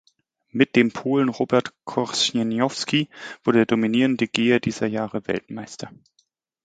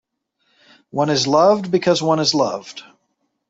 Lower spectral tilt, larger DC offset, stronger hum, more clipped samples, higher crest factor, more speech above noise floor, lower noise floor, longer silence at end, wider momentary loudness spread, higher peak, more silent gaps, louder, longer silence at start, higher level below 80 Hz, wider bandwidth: about the same, -4.5 dB/octave vs -4.5 dB/octave; neither; neither; neither; about the same, 22 dB vs 18 dB; second, 46 dB vs 54 dB; about the same, -68 dBFS vs -71 dBFS; about the same, 0.75 s vs 0.7 s; second, 13 LU vs 16 LU; about the same, 0 dBFS vs -2 dBFS; neither; second, -22 LUFS vs -17 LUFS; second, 0.55 s vs 0.95 s; about the same, -62 dBFS vs -62 dBFS; first, 9.4 kHz vs 8 kHz